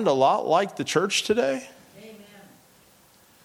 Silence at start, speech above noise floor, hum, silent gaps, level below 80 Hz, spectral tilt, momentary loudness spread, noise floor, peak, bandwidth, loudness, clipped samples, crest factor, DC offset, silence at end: 0 s; 34 dB; none; none; -70 dBFS; -3.5 dB/octave; 25 LU; -57 dBFS; -8 dBFS; 18.5 kHz; -23 LUFS; under 0.1%; 18 dB; under 0.1%; 1.2 s